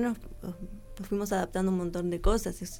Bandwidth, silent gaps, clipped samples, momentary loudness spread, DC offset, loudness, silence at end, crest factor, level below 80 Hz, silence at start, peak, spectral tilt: 17.5 kHz; none; under 0.1%; 14 LU; under 0.1%; -31 LUFS; 0 s; 20 dB; -38 dBFS; 0 s; -12 dBFS; -6 dB/octave